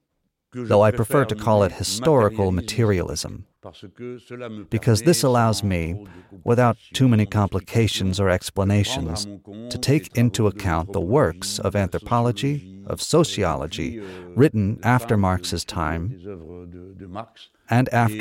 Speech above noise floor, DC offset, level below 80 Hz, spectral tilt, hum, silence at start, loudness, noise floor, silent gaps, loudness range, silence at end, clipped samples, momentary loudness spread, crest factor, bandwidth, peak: 53 dB; under 0.1%; -44 dBFS; -5.5 dB/octave; none; 0.55 s; -21 LUFS; -75 dBFS; none; 3 LU; 0 s; under 0.1%; 17 LU; 16 dB; 16.5 kHz; -6 dBFS